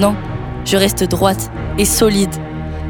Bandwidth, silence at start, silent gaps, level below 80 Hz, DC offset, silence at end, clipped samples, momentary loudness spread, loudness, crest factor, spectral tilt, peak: 19 kHz; 0 s; none; -28 dBFS; under 0.1%; 0 s; under 0.1%; 12 LU; -16 LUFS; 16 dB; -4.5 dB/octave; 0 dBFS